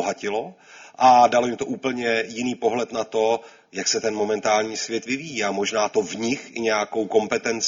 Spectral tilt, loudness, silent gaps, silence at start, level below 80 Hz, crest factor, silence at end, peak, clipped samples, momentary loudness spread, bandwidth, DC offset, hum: -3 dB/octave; -22 LUFS; none; 0 s; -66 dBFS; 18 dB; 0 s; -4 dBFS; under 0.1%; 10 LU; 7.6 kHz; under 0.1%; none